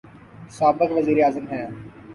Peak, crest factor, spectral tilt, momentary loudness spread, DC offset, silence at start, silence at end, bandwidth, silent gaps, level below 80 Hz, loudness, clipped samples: -6 dBFS; 16 dB; -7 dB/octave; 18 LU; under 0.1%; 0.35 s; 0 s; 11.5 kHz; none; -58 dBFS; -21 LUFS; under 0.1%